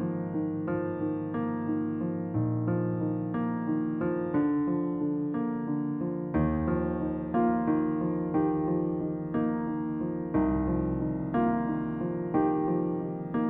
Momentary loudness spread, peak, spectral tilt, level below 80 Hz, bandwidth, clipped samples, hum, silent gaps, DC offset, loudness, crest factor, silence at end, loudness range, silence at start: 5 LU; -14 dBFS; -13 dB/octave; -48 dBFS; 3.2 kHz; under 0.1%; none; none; under 0.1%; -30 LUFS; 14 dB; 0 s; 2 LU; 0 s